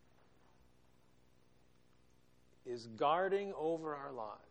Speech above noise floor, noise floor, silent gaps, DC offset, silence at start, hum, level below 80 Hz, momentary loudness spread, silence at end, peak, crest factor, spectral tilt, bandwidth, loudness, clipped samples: 33 dB; -72 dBFS; none; under 0.1%; 2.65 s; none; -78 dBFS; 14 LU; 0.15 s; -20 dBFS; 22 dB; -6 dB/octave; 9.4 kHz; -39 LUFS; under 0.1%